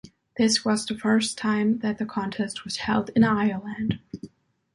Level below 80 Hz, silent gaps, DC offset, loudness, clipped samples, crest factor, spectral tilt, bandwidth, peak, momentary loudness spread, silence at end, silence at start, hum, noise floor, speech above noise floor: -56 dBFS; none; under 0.1%; -25 LUFS; under 0.1%; 18 dB; -4.5 dB/octave; 11.5 kHz; -8 dBFS; 9 LU; 0.45 s; 0.05 s; none; -50 dBFS; 26 dB